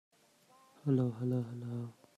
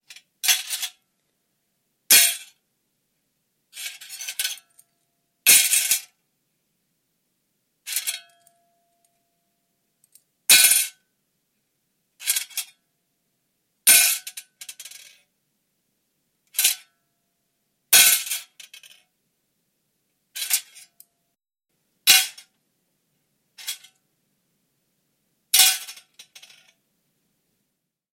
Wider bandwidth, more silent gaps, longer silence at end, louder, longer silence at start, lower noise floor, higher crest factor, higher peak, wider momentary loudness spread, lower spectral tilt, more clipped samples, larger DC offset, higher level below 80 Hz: second, 10 kHz vs 16.5 kHz; neither; second, 0.25 s vs 2.2 s; second, -36 LUFS vs -17 LUFS; first, 0.85 s vs 0.45 s; second, -67 dBFS vs -79 dBFS; second, 18 dB vs 24 dB; second, -20 dBFS vs -2 dBFS; second, 10 LU vs 24 LU; first, -10 dB/octave vs 3.5 dB/octave; neither; neither; first, -76 dBFS vs -88 dBFS